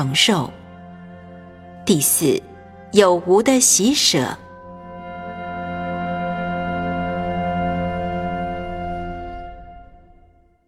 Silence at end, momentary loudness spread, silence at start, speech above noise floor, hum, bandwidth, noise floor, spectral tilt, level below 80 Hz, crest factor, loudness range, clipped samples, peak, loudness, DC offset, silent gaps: 0.85 s; 24 LU; 0 s; 37 dB; none; 16.5 kHz; -53 dBFS; -3.5 dB/octave; -42 dBFS; 22 dB; 10 LU; under 0.1%; 0 dBFS; -19 LUFS; under 0.1%; none